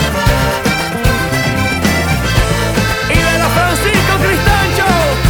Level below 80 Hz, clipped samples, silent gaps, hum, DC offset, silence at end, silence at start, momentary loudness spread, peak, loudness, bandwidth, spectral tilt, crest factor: -22 dBFS; under 0.1%; none; none; under 0.1%; 0 s; 0 s; 3 LU; 0 dBFS; -12 LUFS; over 20 kHz; -4.5 dB/octave; 12 dB